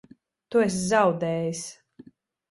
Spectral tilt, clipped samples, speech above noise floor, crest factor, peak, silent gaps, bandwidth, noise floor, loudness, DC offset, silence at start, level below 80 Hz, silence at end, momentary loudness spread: -5 dB/octave; under 0.1%; 29 dB; 18 dB; -8 dBFS; none; 11.5 kHz; -53 dBFS; -25 LUFS; under 0.1%; 0.5 s; -62 dBFS; 0.75 s; 12 LU